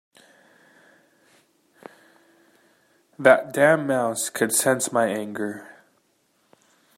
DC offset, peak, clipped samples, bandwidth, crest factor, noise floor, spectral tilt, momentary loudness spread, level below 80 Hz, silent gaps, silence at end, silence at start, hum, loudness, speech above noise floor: under 0.1%; -2 dBFS; under 0.1%; 16 kHz; 24 dB; -67 dBFS; -3.5 dB/octave; 13 LU; -74 dBFS; none; 1.3 s; 3.2 s; none; -21 LUFS; 46 dB